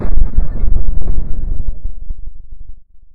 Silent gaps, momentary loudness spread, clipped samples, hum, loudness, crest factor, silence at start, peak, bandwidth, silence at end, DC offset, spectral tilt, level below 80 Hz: none; 20 LU; 2%; none; -23 LUFS; 8 dB; 0 s; 0 dBFS; 1.4 kHz; 0.1 s; under 0.1%; -12 dB/octave; -16 dBFS